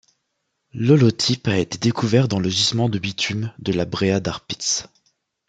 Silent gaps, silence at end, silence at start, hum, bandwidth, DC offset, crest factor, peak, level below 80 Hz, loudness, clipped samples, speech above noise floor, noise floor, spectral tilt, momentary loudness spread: none; 0.65 s; 0.75 s; none; 9.4 kHz; under 0.1%; 18 dB; -2 dBFS; -54 dBFS; -20 LUFS; under 0.1%; 55 dB; -75 dBFS; -5 dB/octave; 9 LU